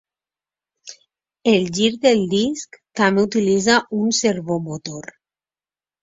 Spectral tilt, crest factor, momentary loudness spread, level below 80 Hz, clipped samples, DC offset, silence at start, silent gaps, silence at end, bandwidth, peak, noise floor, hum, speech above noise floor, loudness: -4 dB/octave; 20 dB; 16 LU; -58 dBFS; under 0.1%; under 0.1%; 0.85 s; none; 1 s; 7.8 kHz; 0 dBFS; under -90 dBFS; none; over 72 dB; -18 LUFS